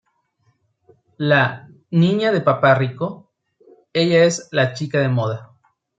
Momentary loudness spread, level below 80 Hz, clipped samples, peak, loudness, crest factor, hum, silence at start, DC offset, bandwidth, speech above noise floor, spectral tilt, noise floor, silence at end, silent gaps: 11 LU; -62 dBFS; under 0.1%; -2 dBFS; -18 LUFS; 18 dB; none; 1.2 s; under 0.1%; 9 kHz; 47 dB; -6 dB/octave; -65 dBFS; 0.55 s; none